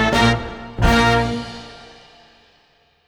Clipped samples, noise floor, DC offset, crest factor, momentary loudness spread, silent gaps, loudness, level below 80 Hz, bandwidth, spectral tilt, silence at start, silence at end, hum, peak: under 0.1%; -58 dBFS; under 0.1%; 18 dB; 19 LU; none; -17 LUFS; -30 dBFS; 19 kHz; -5 dB/octave; 0 s; 1.2 s; none; -2 dBFS